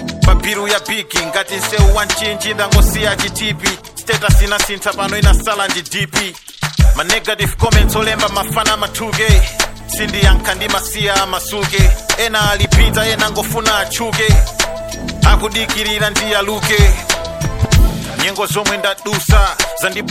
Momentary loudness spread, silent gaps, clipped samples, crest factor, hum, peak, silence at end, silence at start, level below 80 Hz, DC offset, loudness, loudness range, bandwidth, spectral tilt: 6 LU; none; under 0.1%; 14 dB; none; 0 dBFS; 0 s; 0 s; -16 dBFS; under 0.1%; -14 LUFS; 1 LU; 17 kHz; -3.5 dB/octave